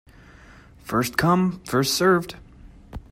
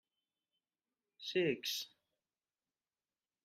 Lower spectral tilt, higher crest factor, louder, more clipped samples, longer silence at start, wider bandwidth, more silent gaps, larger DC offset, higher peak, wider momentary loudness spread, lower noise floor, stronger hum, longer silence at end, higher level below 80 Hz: first, -5 dB/octave vs -3.5 dB/octave; about the same, 20 dB vs 22 dB; first, -21 LUFS vs -38 LUFS; neither; second, 0.85 s vs 1.2 s; about the same, 16 kHz vs 15 kHz; neither; neither; first, -4 dBFS vs -24 dBFS; first, 23 LU vs 13 LU; second, -48 dBFS vs under -90 dBFS; neither; second, 0.1 s vs 1.55 s; first, -48 dBFS vs -86 dBFS